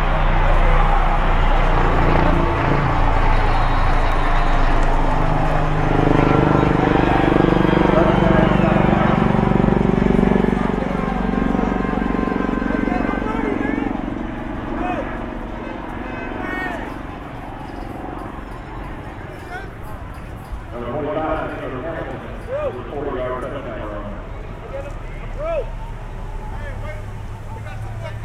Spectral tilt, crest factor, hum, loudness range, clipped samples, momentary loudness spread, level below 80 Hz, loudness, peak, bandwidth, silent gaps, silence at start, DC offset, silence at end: -8 dB/octave; 18 dB; none; 14 LU; under 0.1%; 17 LU; -22 dBFS; -19 LUFS; 0 dBFS; 7.6 kHz; none; 0 s; under 0.1%; 0 s